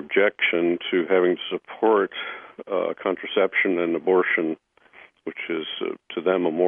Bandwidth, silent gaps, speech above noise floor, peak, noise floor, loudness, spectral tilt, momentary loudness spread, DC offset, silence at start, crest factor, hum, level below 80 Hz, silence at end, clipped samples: 3.7 kHz; none; 29 dB; -6 dBFS; -52 dBFS; -23 LUFS; -8 dB/octave; 12 LU; under 0.1%; 0 s; 16 dB; none; -76 dBFS; 0 s; under 0.1%